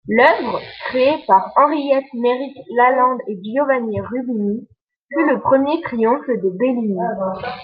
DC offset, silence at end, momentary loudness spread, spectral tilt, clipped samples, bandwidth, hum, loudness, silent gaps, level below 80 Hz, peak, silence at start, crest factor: under 0.1%; 0 s; 10 LU; -8.5 dB/octave; under 0.1%; 5.4 kHz; none; -18 LUFS; 4.81-4.87 s, 4.96-5.09 s; -60 dBFS; -2 dBFS; 0.05 s; 16 dB